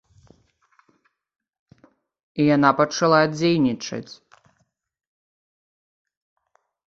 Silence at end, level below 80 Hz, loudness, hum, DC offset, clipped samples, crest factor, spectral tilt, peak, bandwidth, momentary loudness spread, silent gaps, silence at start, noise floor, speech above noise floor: 2.75 s; -64 dBFS; -19 LUFS; none; under 0.1%; under 0.1%; 22 dB; -5.5 dB/octave; -2 dBFS; 7.6 kHz; 17 LU; none; 2.35 s; -70 dBFS; 50 dB